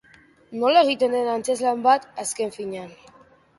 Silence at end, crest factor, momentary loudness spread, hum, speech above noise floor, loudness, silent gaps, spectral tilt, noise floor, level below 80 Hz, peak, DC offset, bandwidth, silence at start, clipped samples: 0.7 s; 20 dB; 16 LU; none; 32 dB; -22 LUFS; none; -3 dB/octave; -53 dBFS; -68 dBFS; -4 dBFS; under 0.1%; 12 kHz; 0.5 s; under 0.1%